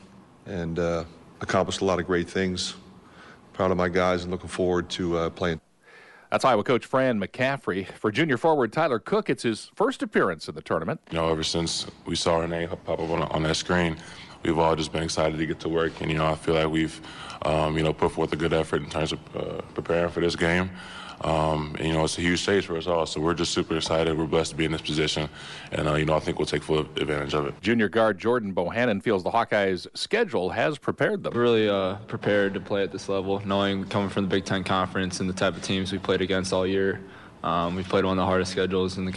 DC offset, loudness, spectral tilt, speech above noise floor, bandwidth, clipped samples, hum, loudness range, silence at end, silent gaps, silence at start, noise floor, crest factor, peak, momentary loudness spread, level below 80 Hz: under 0.1%; -26 LUFS; -5 dB/octave; 27 dB; 11.5 kHz; under 0.1%; none; 2 LU; 0 s; none; 0.05 s; -52 dBFS; 16 dB; -10 dBFS; 7 LU; -48 dBFS